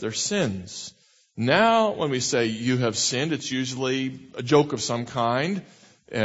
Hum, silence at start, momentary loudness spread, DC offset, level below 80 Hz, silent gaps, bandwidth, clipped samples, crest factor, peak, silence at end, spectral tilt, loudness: none; 0 s; 14 LU; under 0.1%; -64 dBFS; none; 8.2 kHz; under 0.1%; 20 dB; -4 dBFS; 0 s; -4 dB/octave; -24 LUFS